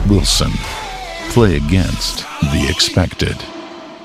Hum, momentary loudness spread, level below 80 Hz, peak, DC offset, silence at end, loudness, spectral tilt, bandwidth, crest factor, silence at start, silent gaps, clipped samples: none; 13 LU; -24 dBFS; 0 dBFS; under 0.1%; 0 s; -16 LUFS; -4.5 dB/octave; 15.5 kHz; 16 dB; 0 s; none; under 0.1%